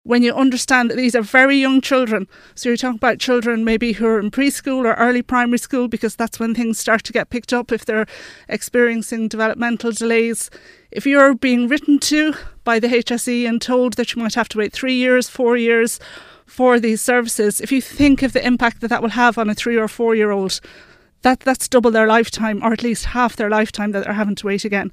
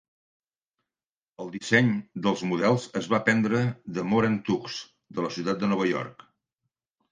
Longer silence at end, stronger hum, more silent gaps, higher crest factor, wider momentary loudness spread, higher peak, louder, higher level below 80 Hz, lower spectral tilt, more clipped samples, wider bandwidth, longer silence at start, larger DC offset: second, 0.05 s vs 1 s; neither; neither; second, 16 dB vs 22 dB; second, 7 LU vs 14 LU; first, 0 dBFS vs -6 dBFS; first, -17 LUFS vs -26 LUFS; first, -44 dBFS vs -66 dBFS; second, -4 dB/octave vs -6 dB/octave; neither; first, 15.5 kHz vs 9.6 kHz; second, 0.05 s vs 1.4 s; neither